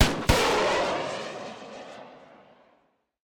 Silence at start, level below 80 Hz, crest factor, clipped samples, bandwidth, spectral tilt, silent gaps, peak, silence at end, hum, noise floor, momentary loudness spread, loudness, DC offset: 0 s; -40 dBFS; 22 dB; under 0.1%; 19 kHz; -4 dB/octave; none; -6 dBFS; 1.15 s; none; -68 dBFS; 21 LU; -25 LUFS; under 0.1%